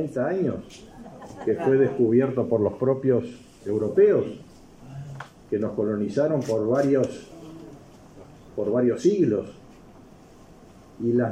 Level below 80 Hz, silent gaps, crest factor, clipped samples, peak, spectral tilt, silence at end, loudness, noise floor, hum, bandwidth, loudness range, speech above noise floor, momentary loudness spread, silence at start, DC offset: -58 dBFS; none; 16 dB; under 0.1%; -8 dBFS; -8 dB/octave; 0 s; -24 LUFS; -49 dBFS; none; 10 kHz; 5 LU; 26 dB; 22 LU; 0 s; under 0.1%